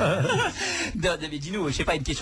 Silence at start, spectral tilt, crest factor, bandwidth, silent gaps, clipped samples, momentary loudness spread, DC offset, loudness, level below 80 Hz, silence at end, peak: 0 s; -4 dB/octave; 14 dB; 11 kHz; none; under 0.1%; 6 LU; under 0.1%; -26 LUFS; -40 dBFS; 0 s; -12 dBFS